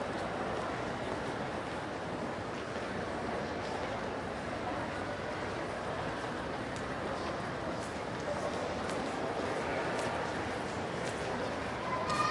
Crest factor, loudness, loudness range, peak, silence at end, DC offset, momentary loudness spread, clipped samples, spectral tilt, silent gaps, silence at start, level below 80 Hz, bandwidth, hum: 18 dB; -37 LUFS; 2 LU; -18 dBFS; 0 s; under 0.1%; 4 LU; under 0.1%; -5 dB/octave; none; 0 s; -56 dBFS; 11.5 kHz; none